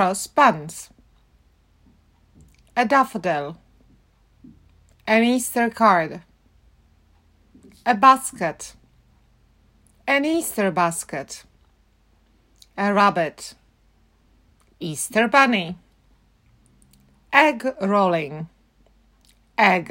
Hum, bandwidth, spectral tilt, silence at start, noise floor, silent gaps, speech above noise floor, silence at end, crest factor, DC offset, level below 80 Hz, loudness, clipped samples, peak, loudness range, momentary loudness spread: none; 16.5 kHz; -4 dB/octave; 0 s; -59 dBFS; none; 40 dB; 0 s; 22 dB; under 0.1%; -60 dBFS; -20 LUFS; under 0.1%; -2 dBFS; 5 LU; 21 LU